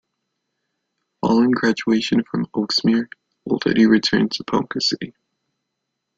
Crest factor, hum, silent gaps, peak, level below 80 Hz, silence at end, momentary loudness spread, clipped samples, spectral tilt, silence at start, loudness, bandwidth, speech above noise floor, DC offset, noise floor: 18 dB; none; none; -4 dBFS; -58 dBFS; 1.1 s; 11 LU; under 0.1%; -5 dB/octave; 1.25 s; -19 LUFS; 7.8 kHz; 59 dB; under 0.1%; -78 dBFS